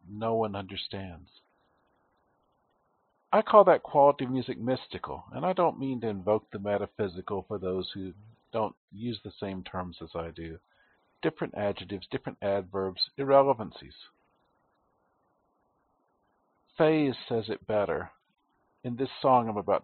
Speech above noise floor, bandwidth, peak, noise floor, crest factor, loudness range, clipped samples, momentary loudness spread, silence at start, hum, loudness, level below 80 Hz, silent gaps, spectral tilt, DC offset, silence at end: 44 dB; 4.5 kHz; -4 dBFS; -73 dBFS; 26 dB; 11 LU; under 0.1%; 16 LU; 0.05 s; none; -29 LUFS; -64 dBFS; 8.77-8.88 s; -4.5 dB/octave; under 0.1%; 0.05 s